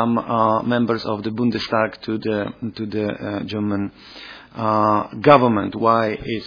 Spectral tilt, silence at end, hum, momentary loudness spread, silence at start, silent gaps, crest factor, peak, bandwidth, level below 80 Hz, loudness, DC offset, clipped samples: -8 dB/octave; 0 s; none; 14 LU; 0 s; none; 20 dB; 0 dBFS; 5.2 kHz; -52 dBFS; -20 LUFS; under 0.1%; under 0.1%